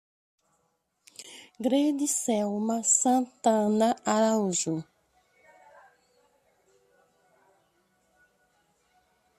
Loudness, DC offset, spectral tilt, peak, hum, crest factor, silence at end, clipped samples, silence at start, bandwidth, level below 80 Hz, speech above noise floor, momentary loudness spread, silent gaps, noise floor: -26 LUFS; under 0.1%; -4 dB/octave; -10 dBFS; none; 20 dB; 4.55 s; under 0.1%; 1.2 s; 14 kHz; -76 dBFS; 49 dB; 22 LU; none; -75 dBFS